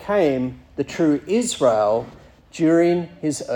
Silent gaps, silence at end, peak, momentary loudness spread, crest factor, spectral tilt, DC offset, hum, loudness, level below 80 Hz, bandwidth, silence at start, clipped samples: none; 0 s; -4 dBFS; 11 LU; 16 dB; -5.5 dB/octave; under 0.1%; none; -20 LUFS; -54 dBFS; 17.5 kHz; 0 s; under 0.1%